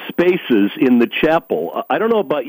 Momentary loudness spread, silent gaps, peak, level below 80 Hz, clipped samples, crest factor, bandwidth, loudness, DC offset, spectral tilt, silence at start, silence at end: 6 LU; none; -4 dBFS; -54 dBFS; under 0.1%; 12 dB; 16 kHz; -16 LUFS; under 0.1%; -7.5 dB/octave; 0 s; 0 s